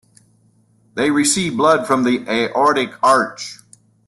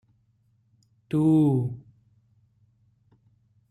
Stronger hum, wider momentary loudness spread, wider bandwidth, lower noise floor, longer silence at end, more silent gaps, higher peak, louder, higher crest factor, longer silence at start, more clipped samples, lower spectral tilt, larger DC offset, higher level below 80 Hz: neither; second, 11 LU vs 15 LU; first, 12.5 kHz vs 10.5 kHz; second, -56 dBFS vs -66 dBFS; second, 0.5 s vs 1.9 s; neither; first, -2 dBFS vs -12 dBFS; first, -16 LUFS vs -23 LUFS; about the same, 16 dB vs 16 dB; second, 0.95 s vs 1.1 s; neither; second, -3.5 dB/octave vs -10 dB/octave; neither; first, -58 dBFS vs -66 dBFS